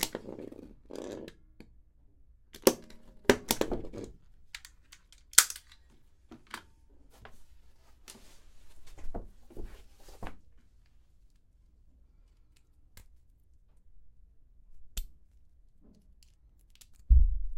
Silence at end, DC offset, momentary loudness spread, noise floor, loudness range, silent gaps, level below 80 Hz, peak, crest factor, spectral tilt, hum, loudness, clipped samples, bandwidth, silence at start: 0 s; under 0.1%; 27 LU; -62 dBFS; 24 LU; none; -38 dBFS; 0 dBFS; 34 dB; -3 dB/octave; none; -30 LUFS; under 0.1%; 16.5 kHz; 0 s